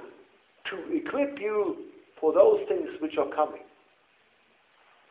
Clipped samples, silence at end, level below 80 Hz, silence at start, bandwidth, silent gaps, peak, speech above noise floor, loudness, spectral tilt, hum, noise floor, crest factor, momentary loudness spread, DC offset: under 0.1%; 1.45 s; -72 dBFS; 0 s; 4 kHz; none; -6 dBFS; 39 dB; -27 LUFS; -8.5 dB/octave; none; -64 dBFS; 22 dB; 18 LU; under 0.1%